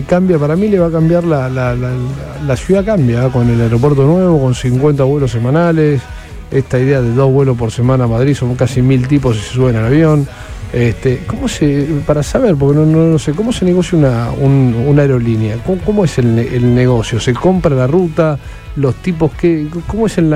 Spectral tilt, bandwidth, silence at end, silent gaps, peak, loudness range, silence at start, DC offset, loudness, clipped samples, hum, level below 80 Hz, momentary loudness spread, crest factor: -7.5 dB/octave; 11.5 kHz; 0 s; none; 0 dBFS; 2 LU; 0 s; under 0.1%; -12 LUFS; under 0.1%; none; -30 dBFS; 7 LU; 12 dB